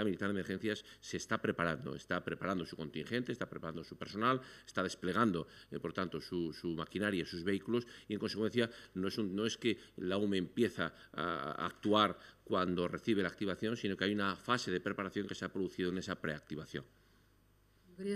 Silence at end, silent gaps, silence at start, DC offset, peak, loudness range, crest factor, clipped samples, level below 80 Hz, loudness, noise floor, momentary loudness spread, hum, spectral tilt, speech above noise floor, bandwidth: 0 s; none; 0 s; under 0.1%; -14 dBFS; 4 LU; 24 dB; under 0.1%; -70 dBFS; -38 LUFS; -69 dBFS; 9 LU; none; -5.5 dB/octave; 32 dB; 14 kHz